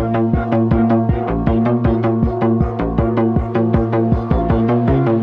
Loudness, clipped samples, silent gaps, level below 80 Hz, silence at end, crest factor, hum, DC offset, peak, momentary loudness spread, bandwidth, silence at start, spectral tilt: -16 LUFS; under 0.1%; none; -26 dBFS; 0 s; 12 dB; none; under 0.1%; -4 dBFS; 3 LU; 5 kHz; 0 s; -11 dB/octave